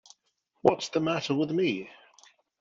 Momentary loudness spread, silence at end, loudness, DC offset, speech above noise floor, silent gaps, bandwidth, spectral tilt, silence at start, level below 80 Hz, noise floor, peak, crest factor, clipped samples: 7 LU; 0.65 s; -28 LUFS; under 0.1%; 48 dB; none; 7.8 kHz; -5.5 dB/octave; 0.65 s; -70 dBFS; -75 dBFS; -6 dBFS; 24 dB; under 0.1%